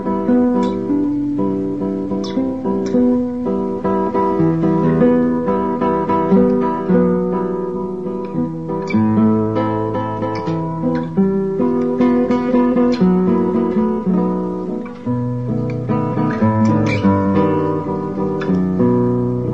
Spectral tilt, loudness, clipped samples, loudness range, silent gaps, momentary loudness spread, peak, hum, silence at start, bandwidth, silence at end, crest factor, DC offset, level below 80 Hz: -9.5 dB/octave; -17 LUFS; under 0.1%; 3 LU; none; 7 LU; -2 dBFS; none; 0 s; 7.4 kHz; 0 s; 14 dB; 0.8%; -44 dBFS